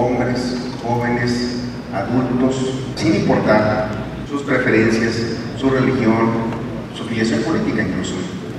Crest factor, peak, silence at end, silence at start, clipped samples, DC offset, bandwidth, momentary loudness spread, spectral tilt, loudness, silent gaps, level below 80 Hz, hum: 16 dB; -2 dBFS; 0 s; 0 s; under 0.1%; under 0.1%; 12 kHz; 10 LU; -6 dB/octave; -19 LUFS; none; -42 dBFS; none